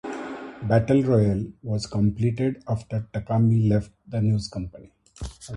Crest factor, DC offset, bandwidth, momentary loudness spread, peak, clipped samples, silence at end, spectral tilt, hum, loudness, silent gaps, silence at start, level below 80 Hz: 16 dB; under 0.1%; 11 kHz; 15 LU; -8 dBFS; under 0.1%; 0 s; -8 dB/octave; none; -24 LUFS; none; 0.05 s; -46 dBFS